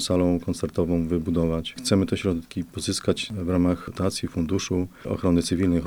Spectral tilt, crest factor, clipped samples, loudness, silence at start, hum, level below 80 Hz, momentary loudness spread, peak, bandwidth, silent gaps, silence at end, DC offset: -5.5 dB/octave; 18 dB; under 0.1%; -25 LUFS; 0 s; none; -44 dBFS; 6 LU; -6 dBFS; 19.5 kHz; none; 0 s; 0.4%